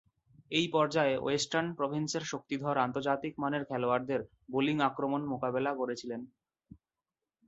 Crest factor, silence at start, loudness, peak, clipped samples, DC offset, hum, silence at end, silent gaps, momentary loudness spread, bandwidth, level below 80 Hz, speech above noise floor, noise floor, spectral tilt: 20 dB; 0.5 s; -32 LUFS; -14 dBFS; under 0.1%; under 0.1%; none; 1.2 s; none; 8 LU; 8.2 kHz; -70 dBFS; over 58 dB; under -90 dBFS; -4.5 dB/octave